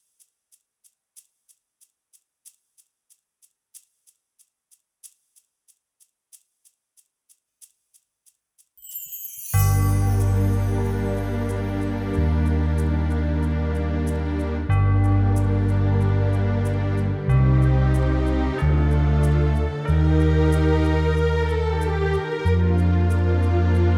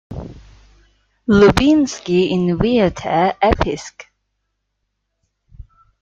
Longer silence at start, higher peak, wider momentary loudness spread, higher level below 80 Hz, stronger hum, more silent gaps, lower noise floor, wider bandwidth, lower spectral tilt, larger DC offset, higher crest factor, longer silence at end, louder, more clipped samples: first, 3.75 s vs 0.1 s; second, -8 dBFS vs -2 dBFS; second, 7 LU vs 21 LU; first, -28 dBFS vs -36 dBFS; neither; neither; second, -65 dBFS vs -73 dBFS; first, 19.5 kHz vs 13 kHz; first, -7.5 dB/octave vs -6 dB/octave; neither; about the same, 14 dB vs 16 dB; second, 0 s vs 0.4 s; second, -21 LUFS vs -15 LUFS; neither